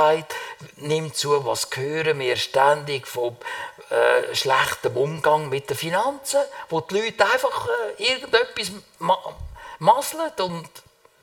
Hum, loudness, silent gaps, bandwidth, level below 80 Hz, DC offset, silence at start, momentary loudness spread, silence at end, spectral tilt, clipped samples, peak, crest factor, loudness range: none; -22 LUFS; none; 18.5 kHz; -54 dBFS; under 0.1%; 0 s; 12 LU; 0.45 s; -3 dB/octave; under 0.1%; -2 dBFS; 22 dB; 1 LU